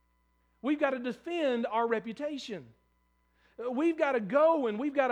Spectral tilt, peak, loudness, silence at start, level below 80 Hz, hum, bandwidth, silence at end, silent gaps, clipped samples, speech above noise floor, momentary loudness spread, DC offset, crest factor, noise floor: -6 dB/octave; -14 dBFS; -30 LUFS; 0.65 s; -74 dBFS; none; 9.8 kHz; 0 s; none; under 0.1%; 42 dB; 13 LU; under 0.1%; 18 dB; -72 dBFS